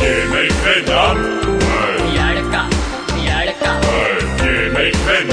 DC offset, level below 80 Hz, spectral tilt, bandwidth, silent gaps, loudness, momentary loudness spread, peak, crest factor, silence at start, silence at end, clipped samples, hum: under 0.1%; -24 dBFS; -4.5 dB/octave; 10.5 kHz; none; -15 LUFS; 4 LU; -2 dBFS; 14 dB; 0 s; 0 s; under 0.1%; none